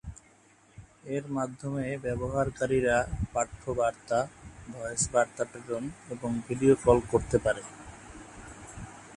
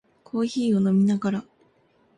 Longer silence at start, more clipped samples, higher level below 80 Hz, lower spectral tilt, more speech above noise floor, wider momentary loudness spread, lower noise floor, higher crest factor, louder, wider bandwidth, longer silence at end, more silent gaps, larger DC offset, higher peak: second, 0.05 s vs 0.35 s; neither; first, -48 dBFS vs -66 dBFS; second, -5.5 dB/octave vs -7.5 dB/octave; second, 31 dB vs 40 dB; first, 21 LU vs 11 LU; about the same, -60 dBFS vs -62 dBFS; first, 22 dB vs 12 dB; second, -29 LUFS vs -24 LUFS; first, 11.5 kHz vs 10 kHz; second, 0 s vs 0.75 s; neither; neither; first, -8 dBFS vs -14 dBFS